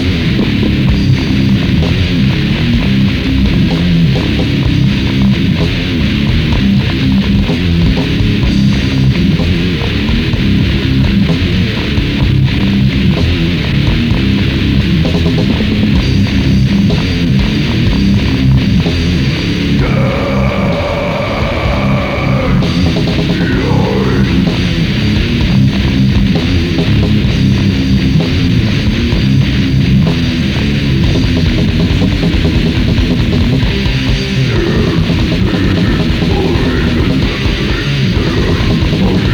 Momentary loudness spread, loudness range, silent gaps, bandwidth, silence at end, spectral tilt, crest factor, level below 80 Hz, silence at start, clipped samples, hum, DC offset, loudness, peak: 2 LU; 1 LU; none; 18 kHz; 0 s; -7 dB/octave; 10 dB; -18 dBFS; 0 s; under 0.1%; none; under 0.1%; -11 LUFS; 0 dBFS